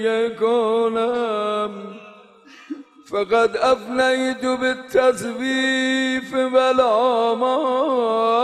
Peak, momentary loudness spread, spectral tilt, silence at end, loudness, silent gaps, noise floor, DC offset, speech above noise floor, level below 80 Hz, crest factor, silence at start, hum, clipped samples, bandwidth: -6 dBFS; 10 LU; -3.5 dB/octave; 0 s; -19 LUFS; none; -46 dBFS; under 0.1%; 27 dB; -60 dBFS; 14 dB; 0 s; none; under 0.1%; 12.5 kHz